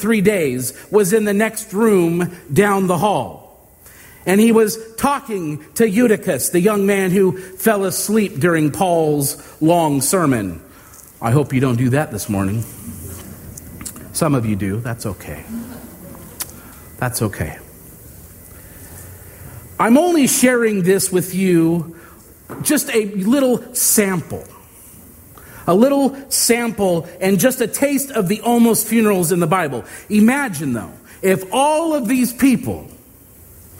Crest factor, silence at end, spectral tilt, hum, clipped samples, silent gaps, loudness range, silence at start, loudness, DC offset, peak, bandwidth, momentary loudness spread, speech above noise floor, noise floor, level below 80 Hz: 18 dB; 0.05 s; -5 dB/octave; none; under 0.1%; none; 8 LU; 0 s; -17 LUFS; under 0.1%; 0 dBFS; 16.5 kHz; 18 LU; 28 dB; -44 dBFS; -48 dBFS